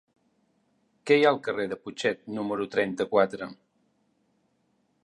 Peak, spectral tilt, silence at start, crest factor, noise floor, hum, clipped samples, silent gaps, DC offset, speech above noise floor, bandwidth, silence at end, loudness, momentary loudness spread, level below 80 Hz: -8 dBFS; -5 dB/octave; 1.05 s; 22 dB; -71 dBFS; none; under 0.1%; none; under 0.1%; 45 dB; 11.5 kHz; 1.5 s; -26 LUFS; 14 LU; -72 dBFS